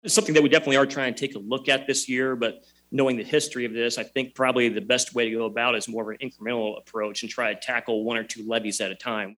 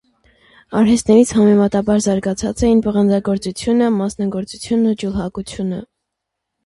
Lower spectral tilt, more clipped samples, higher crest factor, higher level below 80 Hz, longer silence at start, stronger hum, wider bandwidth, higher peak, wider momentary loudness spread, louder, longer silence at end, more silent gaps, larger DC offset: second, -3 dB/octave vs -6 dB/octave; neither; first, 22 dB vs 16 dB; second, -72 dBFS vs -40 dBFS; second, 0.05 s vs 0.7 s; neither; first, 15.5 kHz vs 11.5 kHz; about the same, -4 dBFS vs -2 dBFS; about the same, 11 LU vs 12 LU; second, -25 LUFS vs -16 LUFS; second, 0.05 s vs 0.8 s; neither; neither